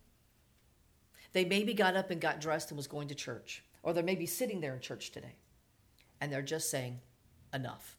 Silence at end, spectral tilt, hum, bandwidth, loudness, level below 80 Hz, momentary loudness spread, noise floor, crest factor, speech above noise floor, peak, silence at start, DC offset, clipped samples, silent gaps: 0.05 s; -4 dB/octave; none; 20 kHz; -36 LUFS; -72 dBFS; 14 LU; -69 dBFS; 22 dB; 33 dB; -16 dBFS; 1.15 s; under 0.1%; under 0.1%; none